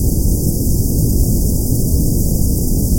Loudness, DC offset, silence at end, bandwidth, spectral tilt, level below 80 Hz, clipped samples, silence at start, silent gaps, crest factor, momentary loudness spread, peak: -16 LUFS; under 0.1%; 0 s; 17 kHz; -7.5 dB/octave; -16 dBFS; under 0.1%; 0 s; none; 12 dB; 1 LU; -2 dBFS